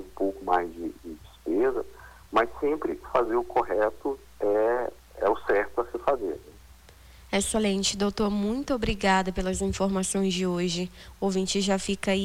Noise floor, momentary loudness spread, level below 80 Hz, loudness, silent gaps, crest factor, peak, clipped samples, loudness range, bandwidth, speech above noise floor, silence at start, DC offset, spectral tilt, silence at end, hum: -51 dBFS; 10 LU; -46 dBFS; -27 LUFS; none; 18 dB; -10 dBFS; under 0.1%; 2 LU; 16 kHz; 25 dB; 0 s; under 0.1%; -4.5 dB/octave; 0 s; none